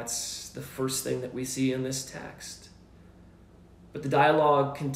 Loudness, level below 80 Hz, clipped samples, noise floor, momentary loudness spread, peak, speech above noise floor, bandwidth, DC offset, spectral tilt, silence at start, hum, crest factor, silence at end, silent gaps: -27 LUFS; -60 dBFS; under 0.1%; -54 dBFS; 19 LU; -10 dBFS; 26 dB; 16 kHz; under 0.1%; -4 dB/octave; 0 s; none; 20 dB; 0 s; none